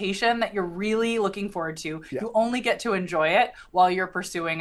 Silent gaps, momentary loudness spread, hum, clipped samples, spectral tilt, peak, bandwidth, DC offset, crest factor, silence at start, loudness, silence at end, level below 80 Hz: none; 9 LU; none; under 0.1%; -4.5 dB/octave; -8 dBFS; 12.5 kHz; under 0.1%; 18 dB; 0 s; -25 LUFS; 0 s; -56 dBFS